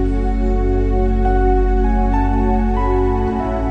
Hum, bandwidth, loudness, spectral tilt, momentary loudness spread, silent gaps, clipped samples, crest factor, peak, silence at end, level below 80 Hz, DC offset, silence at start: none; 4.3 kHz; -18 LUFS; -9.5 dB/octave; 3 LU; none; under 0.1%; 10 dB; -4 dBFS; 0 s; -18 dBFS; under 0.1%; 0 s